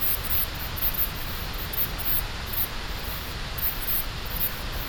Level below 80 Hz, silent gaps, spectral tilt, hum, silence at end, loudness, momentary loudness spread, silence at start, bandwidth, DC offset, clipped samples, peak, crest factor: -36 dBFS; none; -3 dB/octave; none; 0 s; -26 LUFS; 9 LU; 0 s; 19 kHz; under 0.1%; under 0.1%; -8 dBFS; 20 dB